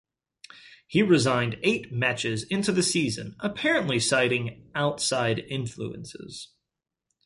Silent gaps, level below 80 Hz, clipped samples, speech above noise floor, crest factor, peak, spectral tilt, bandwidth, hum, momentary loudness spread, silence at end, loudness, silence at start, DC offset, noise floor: none; -60 dBFS; under 0.1%; 60 dB; 18 dB; -8 dBFS; -4 dB/octave; 11.5 kHz; none; 15 LU; 0.8 s; -25 LUFS; 0.65 s; under 0.1%; -86 dBFS